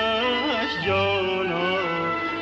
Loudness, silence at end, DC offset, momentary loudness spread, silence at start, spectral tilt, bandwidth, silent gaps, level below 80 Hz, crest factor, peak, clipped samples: -23 LUFS; 0 s; under 0.1%; 3 LU; 0 s; -5.5 dB/octave; 8 kHz; none; -52 dBFS; 12 dB; -10 dBFS; under 0.1%